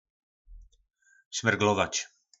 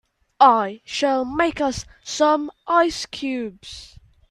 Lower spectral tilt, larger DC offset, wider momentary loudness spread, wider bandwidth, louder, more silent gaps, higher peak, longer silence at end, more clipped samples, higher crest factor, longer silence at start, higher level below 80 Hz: about the same, -3.5 dB/octave vs -3.5 dB/octave; neither; second, 12 LU vs 17 LU; second, 8.2 kHz vs 12.5 kHz; second, -27 LUFS vs -20 LUFS; first, 1.26-1.31 s vs none; second, -8 dBFS vs -2 dBFS; about the same, 0.35 s vs 0.45 s; neither; about the same, 24 dB vs 20 dB; about the same, 0.5 s vs 0.4 s; second, -58 dBFS vs -50 dBFS